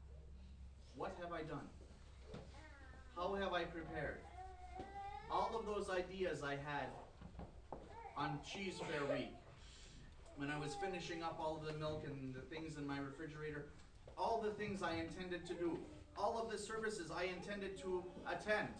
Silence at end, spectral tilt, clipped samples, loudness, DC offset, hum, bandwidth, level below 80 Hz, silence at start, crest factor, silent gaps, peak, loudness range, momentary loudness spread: 0 s; -5 dB/octave; under 0.1%; -46 LUFS; under 0.1%; none; 10.5 kHz; -62 dBFS; 0 s; 20 dB; none; -26 dBFS; 3 LU; 17 LU